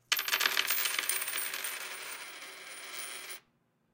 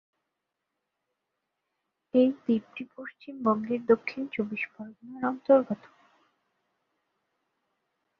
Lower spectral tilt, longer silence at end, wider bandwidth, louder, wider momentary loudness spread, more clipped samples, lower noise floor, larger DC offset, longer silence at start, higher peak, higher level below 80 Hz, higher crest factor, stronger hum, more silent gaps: second, 2.5 dB/octave vs -8.5 dB/octave; second, 0.55 s vs 2.45 s; first, 17 kHz vs 5.6 kHz; second, -32 LUFS vs -28 LUFS; second, 16 LU vs 19 LU; neither; second, -73 dBFS vs -84 dBFS; neither; second, 0.1 s vs 2.15 s; about the same, -10 dBFS vs -8 dBFS; second, -88 dBFS vs -76 dBFS; about the same, 26 dB vs 22 dB; neither; neither